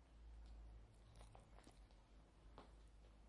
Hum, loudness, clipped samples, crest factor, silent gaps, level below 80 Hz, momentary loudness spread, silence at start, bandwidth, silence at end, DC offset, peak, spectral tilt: none; -66 LUFS; under 0.1%; 16 dB; none; -64 dBFS; 6 LU; 0 s; 11 kHz; 0 s; under 0.1%; -46 dBFS; -5.5 dB/octave